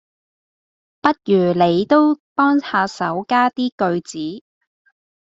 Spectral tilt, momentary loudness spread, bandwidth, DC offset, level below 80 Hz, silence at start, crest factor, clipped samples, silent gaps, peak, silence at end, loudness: -6 dB/octave; 11 LU; 7.8 kHz; under 0.1%; -62 dBFS; 1.05 s; 18 dB; under 0.1%; 2.20-2.36 s, 3.72-3.78 s; -2 dBFS; 0.9 s; -18 LUFS